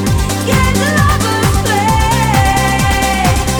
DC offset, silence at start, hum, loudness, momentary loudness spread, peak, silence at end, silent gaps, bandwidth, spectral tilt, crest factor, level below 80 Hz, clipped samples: under 0.1%; 0 s; none; -12 LUFS; 2 LU; 0 dBFS; 0 s; none; over 20 kHz; -4.5 dB/octave; 12 dB; -20 dBFS; under 0.1%